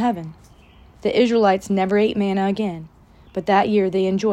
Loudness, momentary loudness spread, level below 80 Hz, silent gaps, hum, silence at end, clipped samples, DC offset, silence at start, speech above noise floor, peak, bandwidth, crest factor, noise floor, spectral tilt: -20 LUFS; 13 LU; -52 dBFS; none; none; 0 s; under 0.1%; under 0.1%; 0 s; 29 dB; -4 dBFS; 12 kHz; 16 dB; -48 dBFS; -6.5 dB/octave